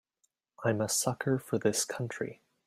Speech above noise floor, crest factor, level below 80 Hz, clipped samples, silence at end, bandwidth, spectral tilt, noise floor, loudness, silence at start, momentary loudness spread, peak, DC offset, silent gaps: 47 dB; 20 dB; -72 dBFS; under 0.1%; 0.3 s; 16 kHz; -4 dB/octave; -78 dBFS; -32 LUFS; 0.6 s; 8 LU; -14 dBFS; under 0.1%; none